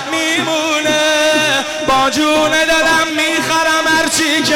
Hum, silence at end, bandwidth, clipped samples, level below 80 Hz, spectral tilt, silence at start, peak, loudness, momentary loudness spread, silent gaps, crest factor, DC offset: none; 0 s; 17 kHz; under 0.1%; -44 dBFS; -1.5 dB/octave; 0 s; -6 dBFS; -12 LUFS; 3 LU; none; 8 dB; under 0.1%